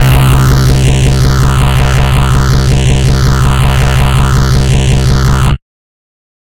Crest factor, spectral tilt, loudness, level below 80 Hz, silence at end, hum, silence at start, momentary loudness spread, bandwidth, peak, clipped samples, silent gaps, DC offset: 8 dB; -5.5 dB/octave; -9 LUFS; -12 dBFS; 0.95 s; none; 0 s; 2 LU; 17 kHz; 0 dBFS; under 0.1%; none; under 0.1%